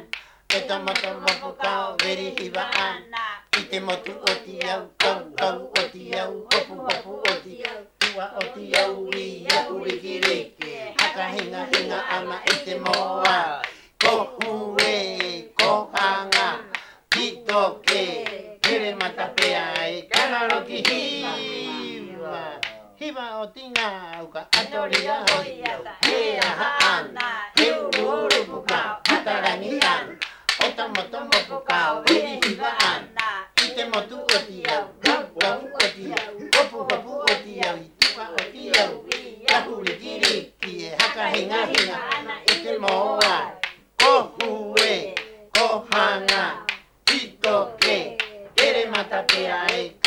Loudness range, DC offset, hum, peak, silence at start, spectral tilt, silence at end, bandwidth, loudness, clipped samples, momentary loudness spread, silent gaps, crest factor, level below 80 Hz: 4 LU; under 0.1%; none; -2 dBFS; 0 s; -1.5 dB/octave; 0 s; 19 kHz; -22 LUFS; under 0.1%; 10 LU; none; 22 dB; -60 dBFS